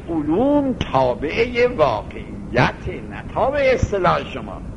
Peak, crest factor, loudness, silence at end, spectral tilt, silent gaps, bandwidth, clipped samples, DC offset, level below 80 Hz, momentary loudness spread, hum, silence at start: 0 dBFS; 18 dB; -19 LUFS; 0 s; -6.5 dB/octave; none; 10.5 kHz; under 0.1%; under 0.1%; -36 dBFS; 13 LU; none; 0 s